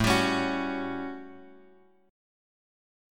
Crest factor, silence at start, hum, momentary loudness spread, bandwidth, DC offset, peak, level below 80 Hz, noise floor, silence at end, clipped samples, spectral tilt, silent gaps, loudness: 22 dB; 0 s; none; 19 LU; 17.5 kHz; under 0.1%; -10 dBFS; -50 dBFS; -59 dBFS; 1 s; under 0.1%; -4.5 dB/octave; none; -29 LUFS